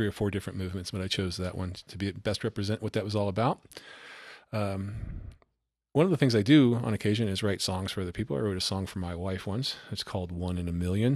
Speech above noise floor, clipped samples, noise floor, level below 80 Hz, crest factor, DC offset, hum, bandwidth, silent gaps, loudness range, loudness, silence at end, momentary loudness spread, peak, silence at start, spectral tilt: 52 dB; under 0.1%; -81 dBFS; -52 dBFS; 20 dB; under 0.1%; none; 13.5 kHz; none; 6 LU; -30 LUFS; 0 s; 14 LU; -8 dBFS; 0 s; -6 dB/octave